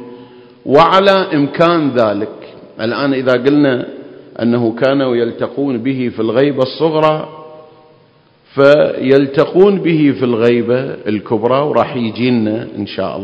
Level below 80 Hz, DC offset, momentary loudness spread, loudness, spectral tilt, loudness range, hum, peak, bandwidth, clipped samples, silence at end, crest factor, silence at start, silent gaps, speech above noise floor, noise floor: -54 dBFS; under 0.1%; 11 LU; -13 LUFS; -8 dB/octave; 3 LU; none; 0 dBFS; 8 kHz; 0.3%; 0 s; 14 dB; 0 s; none; 37 dB; -49 dBFS